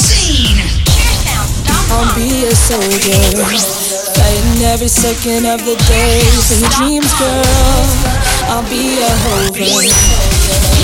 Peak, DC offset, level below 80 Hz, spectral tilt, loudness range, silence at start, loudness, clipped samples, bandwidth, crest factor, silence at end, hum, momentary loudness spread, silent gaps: 0 dBFS; 0.5%; -14 dBFS; -3.5 dB/octave; 1 LU; 0 s; -10 LUFS; under 0.1%; 17.5 kHz; 10 dB; 0 s; none; 5 LU; none